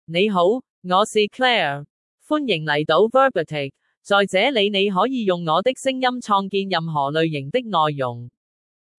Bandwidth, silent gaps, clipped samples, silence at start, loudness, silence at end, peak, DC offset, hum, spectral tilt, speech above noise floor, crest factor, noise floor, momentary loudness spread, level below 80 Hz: 12 kHz; 0.70-0.82 s, 1.90-2.18 s, 3.97-4.01 s; under 0.1%; 0.1 s; -20 LUFS; 0.7 s; -4 dBFS; under 0.1%; none; -5 dB/octave; over 70 dB; 16 dB; under -90 dBFS; 8 LU; -70 dBFS